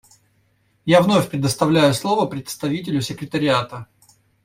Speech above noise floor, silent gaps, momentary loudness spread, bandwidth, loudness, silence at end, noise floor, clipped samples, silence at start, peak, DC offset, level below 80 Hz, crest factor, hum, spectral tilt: 44 dB; none; 11 LU; 16 kHz; -19 LUFS; 0.6 s; -62 dBFS; under 0.1%; 0.85 s; -2 dBFS; under 0.1%; -54 dBFS; 18 dB; none; -5.5 dB/octave